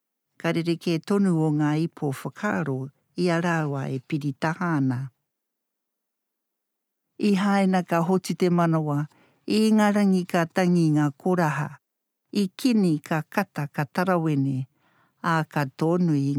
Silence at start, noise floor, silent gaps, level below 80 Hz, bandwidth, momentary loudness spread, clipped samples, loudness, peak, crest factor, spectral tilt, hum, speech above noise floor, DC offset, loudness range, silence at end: 0.45 s; -82 dBFS; none; -76 dBFS; 15.5 kHz; 9 LU; under 0.1%; -24 LUFS; -6 dBFS; 18 dB; -7 dB/octave; none; 59 dB; under 0.1%; 6 LU; 0 s